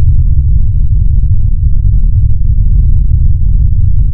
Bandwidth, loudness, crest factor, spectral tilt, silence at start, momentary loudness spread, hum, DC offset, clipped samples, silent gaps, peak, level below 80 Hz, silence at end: 0.7 kHz; -12 LUFS; 6 dB; -20 dB/octave; 0 s; 2 LU; none; under 0.1%; 0.3%; none; 0 dBFS; -8 dBFS; 0 s